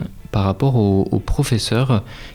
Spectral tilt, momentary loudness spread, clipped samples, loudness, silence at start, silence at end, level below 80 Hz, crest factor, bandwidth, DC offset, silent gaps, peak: -6.5 dB/octave; 5 LU; under 0.1%; -18 LUFS; 0 s; 0 s; -32 dBFS; 12 dB; 15.5 kHz; under 0.1%; none; -6 dBFS